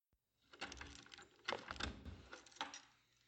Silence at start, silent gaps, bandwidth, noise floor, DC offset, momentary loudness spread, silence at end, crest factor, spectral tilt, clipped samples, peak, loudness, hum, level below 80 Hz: 0.5 s; none; 16.5 kHz; -82 dBFS; under 0.1%; 12 LU; 0.3 s; 28 dB; -3 dB/octave; under 0.1%; -26 dBFS; -51 LUFS; none; -64 dBFS